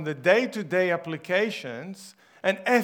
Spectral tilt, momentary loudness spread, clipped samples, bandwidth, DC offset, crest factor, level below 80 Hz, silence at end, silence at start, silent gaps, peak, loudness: -5 dB/octave; 15 LU; under 0.1%; 19.5 kHz; under 0.1%; 20 dB; -84 dBFS; 0 s; 0 s; none; -6 dBFS; -25 LUFS